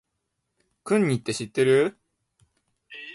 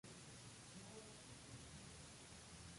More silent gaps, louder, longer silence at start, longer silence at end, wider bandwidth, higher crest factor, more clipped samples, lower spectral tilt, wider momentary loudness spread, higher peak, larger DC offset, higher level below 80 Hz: neither; first, -23 LUFS vs -58 LUFS; first, 0.85 s vs 0.05 s; about the same, 0 s vs 0 s; about the same, 11.5 kHz vs 11.5 kHz; about the same, 18 dB vs 14 dB; neither; first, -5.5 dB/octave vs -3.5 dB/octave; first, 22 LU vs 1 LU; first, -8 dBFS vs -44 dBFS; neither; about the same, -66 dBFS vs -70 dBFS